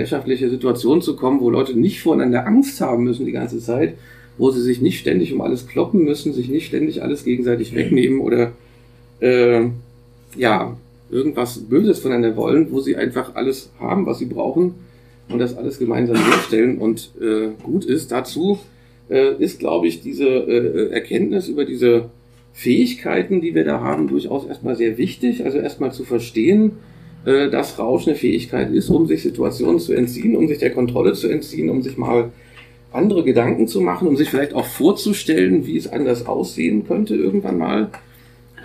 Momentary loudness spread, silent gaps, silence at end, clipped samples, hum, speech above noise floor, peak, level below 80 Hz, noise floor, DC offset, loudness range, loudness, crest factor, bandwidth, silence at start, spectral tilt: 7 LU; none; 0 s; under 0.1%; none; 29 dB; 0 dBFS; -50 dBFS; -47 dBFS; under 0.1%; 2 LU; -18 LUFS; 18 dB; 15.5 kHz; 0 s; -6.5 dB/octave